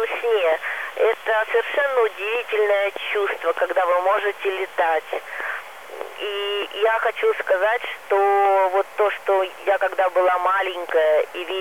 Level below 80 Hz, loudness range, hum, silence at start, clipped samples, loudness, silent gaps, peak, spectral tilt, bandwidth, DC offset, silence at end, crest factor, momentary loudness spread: -76 dBFS; 4 LU; none; 0 s; under 0.1%; -21 LUFS; none; -8 dBFS; -1.5 dB/octave; 16 kHz; 0.4%; 0 s; 12 dB; 8 LU